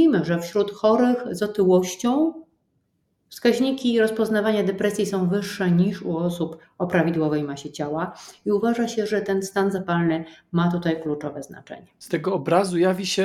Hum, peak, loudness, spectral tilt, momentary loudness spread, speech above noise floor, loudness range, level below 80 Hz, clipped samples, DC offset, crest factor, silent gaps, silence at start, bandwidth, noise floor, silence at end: none; -4 dBFS; -23 LUFS; -6 dB/octave; 11 LU; 48 dB; 3 LU; -62 dBFS; under 0.1%; under 0.1%; 18 dB; none; 0 s; 14 kHz; -71 dBFS; 0 s